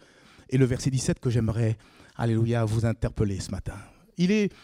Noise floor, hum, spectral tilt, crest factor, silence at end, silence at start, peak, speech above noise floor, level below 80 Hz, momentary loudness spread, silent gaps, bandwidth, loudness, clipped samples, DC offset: -54 dBFS; none; -6.5 dB/octave; 18 dB; 0.15 s; 0.5 s; -10 dBFS; 28 dB; -44 dBFS; 13 LU; none; 12 kHz; -27 LUFS; under 0.1%; under 0.1%